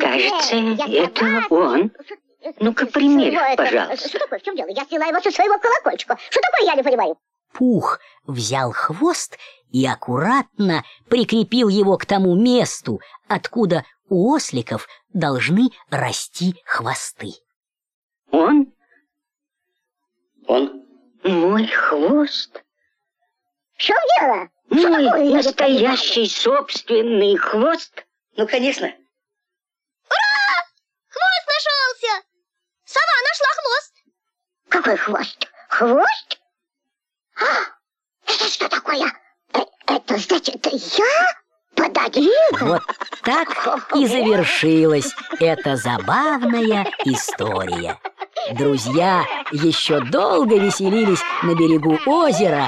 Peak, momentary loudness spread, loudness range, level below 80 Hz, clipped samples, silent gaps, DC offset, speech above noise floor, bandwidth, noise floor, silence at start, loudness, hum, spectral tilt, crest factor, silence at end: -4 dBFS; 10 LU; 5 LU; -64 dBFS; under 0.1%; 17.56-17.61 s, 17.94-18.09 s; under 0.1%; 69 dB; 13.5 kHz; -86 dBFS; 0 s; -18 LUFS; none; -4.5 dB/octave; 14 dB; 0 s